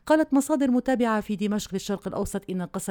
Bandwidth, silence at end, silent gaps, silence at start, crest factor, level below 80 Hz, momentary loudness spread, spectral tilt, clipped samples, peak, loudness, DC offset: 19.5 kHz; 0 s; none; 0.05 s; 16 dB; -50 dBFS; 9 LU; -5.5 dB/octave; under 0.1%; -8 dBFS; -26 LUFS; under 0.1%